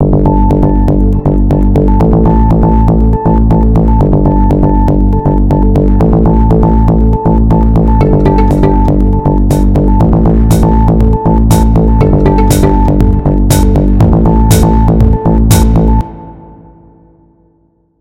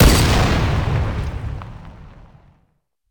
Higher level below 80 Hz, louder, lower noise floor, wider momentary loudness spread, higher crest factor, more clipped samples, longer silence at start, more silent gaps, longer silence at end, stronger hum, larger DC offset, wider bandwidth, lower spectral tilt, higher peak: first, -10 dBFS vs -22 dBFS; first, -8 LUFS vs -19 LUFS; second, -52 dBFS vs -65 dBFS; second, 2 LU vs 23 LU; second, 6 dB vs 16 dB; first, 0.8% vs under 0.1%; about the same, 0 s vs 0 s; neither; first, 1.55 s vs 1 s; neither; first, 1% vs under 0.1%; second, 16 kHz vs 19.5 kHz; first, -8 dB/octave vs -5 dB/octave; about the same, 0 dBFS vs -2 dBFS